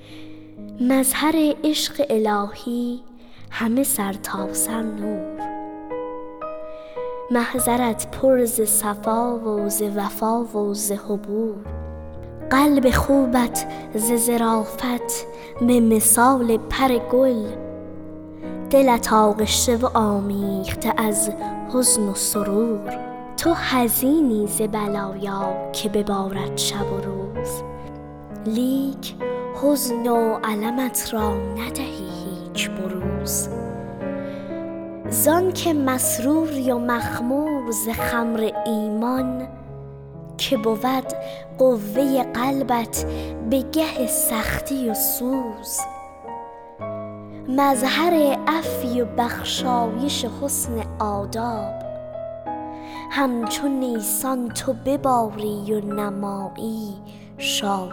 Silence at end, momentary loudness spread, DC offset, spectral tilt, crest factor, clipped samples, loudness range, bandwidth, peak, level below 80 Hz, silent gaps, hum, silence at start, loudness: 0 s; 15 LU; under 0.1%; -4 dB/octave; 16 dB; under 0.1%; 6 LU; over 20 kHz; -6 dBFS; -44 dBFS; none; none; 0 s; -21 LUFS